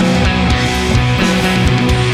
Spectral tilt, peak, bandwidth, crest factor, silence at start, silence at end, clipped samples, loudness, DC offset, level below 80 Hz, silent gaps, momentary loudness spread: -5.5 dB/octave; 0 dBFS; 15 kHz; 12 dB; 0 s; 0 s; under 0.1%; -13 LUFS; under 0.1%; -20 dBFS; none; 1 LU